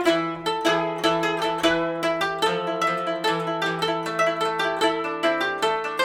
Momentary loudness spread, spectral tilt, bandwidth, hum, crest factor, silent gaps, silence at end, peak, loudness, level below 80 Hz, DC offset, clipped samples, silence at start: 2 LU; -4 dB/octave; 19 kHz; none; 16 dB; none; 0 s; -6 dBFS; -23 LUFS; -60 dBFS; under 0.1%; under 0.1%; 0 s